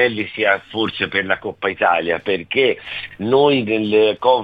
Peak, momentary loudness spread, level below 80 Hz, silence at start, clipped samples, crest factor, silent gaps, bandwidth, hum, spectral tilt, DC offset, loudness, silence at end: -2 dBFS; 8 LU; -56 dBFS; 0 s; under 0.1%; 16 dB; none; 5 kHz; none; -7 dB/octave; 0.1%; -18 LUFS; 0 s